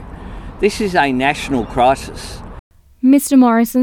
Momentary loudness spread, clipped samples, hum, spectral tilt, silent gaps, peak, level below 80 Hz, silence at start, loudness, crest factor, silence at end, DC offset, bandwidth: 21 LU; under 0.1%; none; -5 dB/octave; 2.59-2.71 s; -2 dBFS; -36 dBFS; 0 s; -14 LUFS; 14 dB; 0 s; under 0.1%; 18.5 kHz